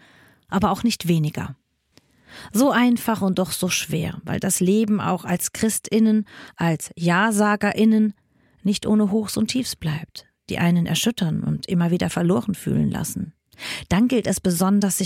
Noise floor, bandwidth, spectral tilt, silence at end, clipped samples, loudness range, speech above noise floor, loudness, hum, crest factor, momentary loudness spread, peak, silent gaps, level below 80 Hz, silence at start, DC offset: -60 dBFS; 17 kHz; -5 dB/octave; 0 s; under 0.1%; 2 LU; 39 dB; -21 LUFS; none; 16 dB; 10 LU; -4 dBFS; none; -50 dBFS; 0.5 s; under 0.1%